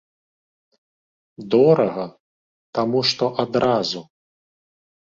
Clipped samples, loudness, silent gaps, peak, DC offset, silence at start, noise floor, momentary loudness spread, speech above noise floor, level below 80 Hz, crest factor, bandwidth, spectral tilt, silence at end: under 0.1%; -19 LUFS; 2.20-2.73 s; -4 dBFS; under 0.1%; 1.4 s; under -90 dBFS; 16 LU; over 71 dB; -62 dBFS; 20 dB; 7.6 kHz; -5.5 dB/octave; 1.1 s